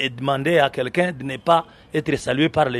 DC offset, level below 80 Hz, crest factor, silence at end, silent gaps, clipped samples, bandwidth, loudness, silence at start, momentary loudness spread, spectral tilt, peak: under 0.1%; -52 dBFS; 18 dB; 0 s; none; under 0.1%; 13.5 kHz; -21 LUFS; 0 s; 7 LU; -5.5 dB/octave; -2 dBFS